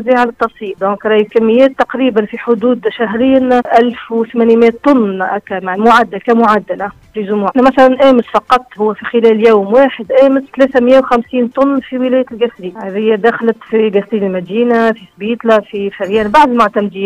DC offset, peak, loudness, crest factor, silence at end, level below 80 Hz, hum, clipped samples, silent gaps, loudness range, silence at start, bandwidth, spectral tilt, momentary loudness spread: under 0.1%; 0 dBFS; -11 LUFS; 10 dB; 0 s; -48 dBFS; none; 0.3%; none; 4 LU; 0 s; 10.5 kHz; -6.5 dB/octave; 9 LU